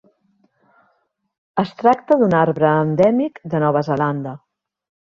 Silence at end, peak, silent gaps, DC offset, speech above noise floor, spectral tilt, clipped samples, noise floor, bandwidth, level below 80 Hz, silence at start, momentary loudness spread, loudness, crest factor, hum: 0.7 s; -2 dBFS; none; under 0.1%; 50 dB; -9 dB/octave; under 0.1%; -67 dBFS; 7.2 kHz; -58 dBFS; 1.55 s; 11 LU; -18 LUFS; 18 dB; none